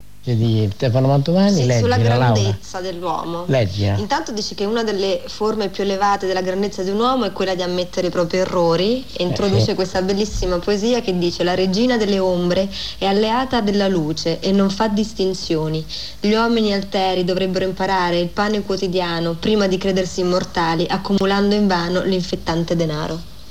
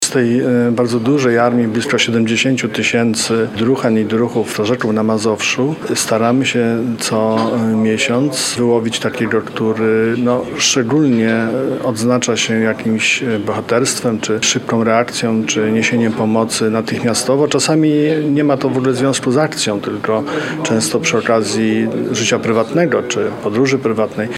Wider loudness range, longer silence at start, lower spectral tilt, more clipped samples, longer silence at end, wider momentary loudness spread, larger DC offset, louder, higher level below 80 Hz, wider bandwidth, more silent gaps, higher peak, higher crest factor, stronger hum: about the same, 2 LU vs 1 LU; first, 0.25 s vs 0 s; first, -6 dB/octave vs -4.5 dB/octave; neither; about the same, 0 s vs 0 s; about the same, 6 LU vs 4 LU; first, 2% vs under 0.1%; second, -19 LUFS vs -15 LUFS; first, -40 dBFS vs -58 dBFS; about the same, 15.5 kHz vs 15 kHz; neither; second, -4 dBFS vs 0 dBFS; about the same, 14 dB vs 14 dB; neither